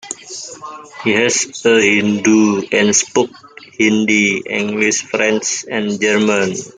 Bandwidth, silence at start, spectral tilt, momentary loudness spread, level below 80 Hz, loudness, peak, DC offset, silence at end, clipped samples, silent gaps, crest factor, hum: 10 kHz; 0.05 s; -3 dB/octave; 15 LU; -60 dBFS; -14 LUFS; 0 dBFS; under 0.1%; 0.05 s; under 0.1%; none; 14 dB; none